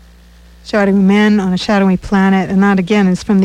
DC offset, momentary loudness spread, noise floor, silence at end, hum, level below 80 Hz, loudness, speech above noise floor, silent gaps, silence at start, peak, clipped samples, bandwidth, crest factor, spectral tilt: under 0.1%; 4 LU; -41 dBFS; 0 s; none; -38 dBFS; -12 LUFS; 30 dB; none; 0.65 s; -2 dBFS; under 0.1%; 9.6 kHz; 10 dB; -7 dB/octave